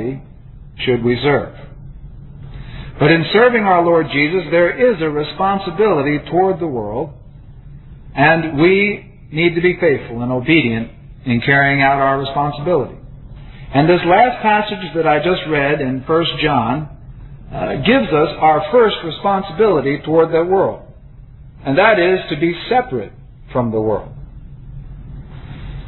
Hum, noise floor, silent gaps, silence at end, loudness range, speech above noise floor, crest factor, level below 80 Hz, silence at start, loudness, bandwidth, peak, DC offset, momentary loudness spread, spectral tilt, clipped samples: none; -38 dBFS; none; 0 s; 3 LU; 24 dB; 16 dB; -38 dBFS; 0 s; -15 LUFS; 4.3 kHz; 0 dBFS; under 0.1%; 19 LU; -10 dB/octave; under 0.1%